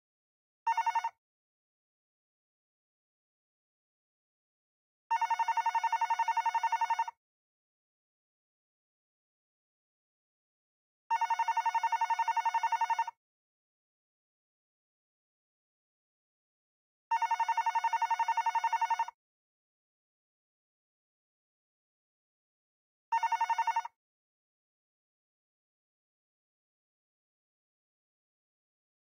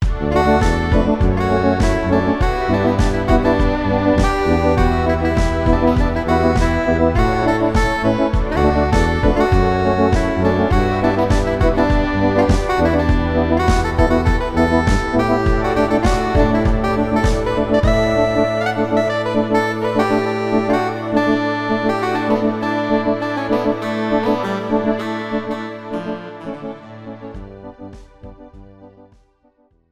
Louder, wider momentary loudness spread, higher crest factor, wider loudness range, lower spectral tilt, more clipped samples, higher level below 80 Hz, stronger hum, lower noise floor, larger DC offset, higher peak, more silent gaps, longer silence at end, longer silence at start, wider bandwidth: second, -32 LUFS vs -17 LUFS; about the same, 5 LU vs 7 LU; about the same, 16 dB vs 14 dB; first, 9 LU vs 6 LU; second, 3.5 dB/octave vs -7 dB/octave; neither; second, under -90 dBFS vs -24 dBFS; neither; first, under -90 dBFS vs -57 dBFS; neither; second, -22 dBFS vs -2 dBFS; first, 1.18-5.10 s, 7.17-11.10 s, 13.17-17.11 s, 19.14-23.12 s vs none; first, 5.15 s vs 1.05 s; first, 0.65 s vs 0 s; first, 16.5 kHz vs 12.5 kHz